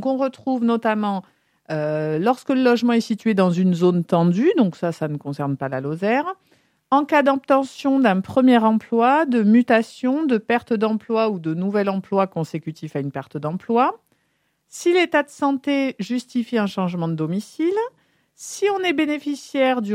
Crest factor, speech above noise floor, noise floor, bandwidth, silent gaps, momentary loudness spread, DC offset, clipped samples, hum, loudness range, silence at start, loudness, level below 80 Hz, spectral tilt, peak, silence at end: 18 dB; 49 dB; -69 dBFS; 13.5 kHz; none; 10 LU; under 0.1%; under 0.1%; none; 6 LU; 0 s; -20 LUFS; -70 dBFS; -6.5 dB/octave; -2 dBFS; 0 s